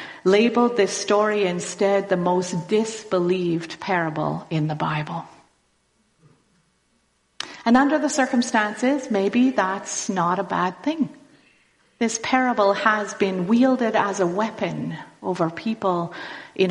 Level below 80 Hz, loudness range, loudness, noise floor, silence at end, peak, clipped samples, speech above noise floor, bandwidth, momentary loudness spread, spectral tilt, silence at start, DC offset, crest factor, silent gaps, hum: -64 dBFS; 6 LU; -22 LUFS; -66 dBFS; 0 s; -4 dBFS; under 0.1%; 45 dB; 11.5 kHz; 9 LU; -5 dB/octave; 0 s; under 0.1%; 18 dB; none; none